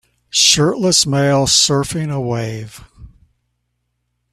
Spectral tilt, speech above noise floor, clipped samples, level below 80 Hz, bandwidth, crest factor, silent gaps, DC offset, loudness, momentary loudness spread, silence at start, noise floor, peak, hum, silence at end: -3 dB/octave; 55 dB; under 0.1%; -46 dBFS; 15 kHz; 18 dB; none; under 0.1%; -14 LUFS; 13 LU; 0.35 s; -70 dBFS; 0 dBFS; 60 Hz at -40 dBFS; 1.25 s